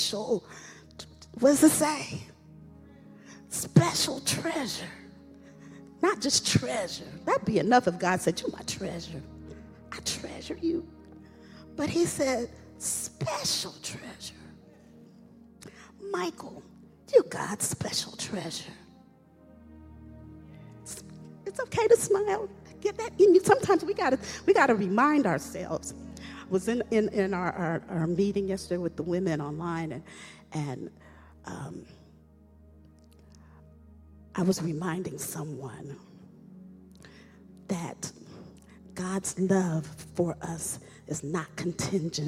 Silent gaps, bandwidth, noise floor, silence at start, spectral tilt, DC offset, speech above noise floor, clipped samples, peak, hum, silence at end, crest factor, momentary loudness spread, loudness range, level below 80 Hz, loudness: none; 16.5 kHz; -56 dBFS; 0 s; -4.5 dB/octave; under 0.1%; 28 dB; under 0.1%; -6 dBFS; none; 0 s; 24 dB; 23 LU; 15 LU; -58 dBFS; -28 LUFS